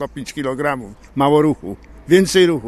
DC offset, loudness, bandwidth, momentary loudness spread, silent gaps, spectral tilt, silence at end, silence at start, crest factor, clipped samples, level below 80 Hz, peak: under 0.1%; -17 LUFS; 13.5 kHz; 15 LU; none; -5.5 dB/octave; 0 s; 0 s; 16 dB; under 0.1%; -44 dBFS; 0 dBFS